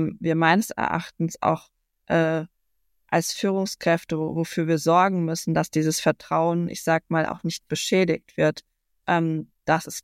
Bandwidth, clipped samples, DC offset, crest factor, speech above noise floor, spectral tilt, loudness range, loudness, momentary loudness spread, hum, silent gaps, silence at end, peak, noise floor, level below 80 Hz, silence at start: 16 kHz; under 0.1%; under 0.1%; 20 dB; 53 dB; -5 dB/octave; 3 LU; -24 LUFS; 8 LU; none; none; 0.05 s; -4 dBFS; -76 dBFS; -60 dBFS; 0 s